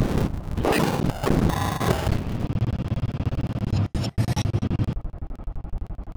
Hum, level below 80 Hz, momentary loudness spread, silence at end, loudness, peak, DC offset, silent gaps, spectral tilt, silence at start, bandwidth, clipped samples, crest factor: none; -32 dBFS; 14 LU; 0.05 s; -25 LUFS; -6 dBFS; under 0.1%; none; -6.5 dB/octave; 0 s; over 20 kHz; under 0.1%; 18 dB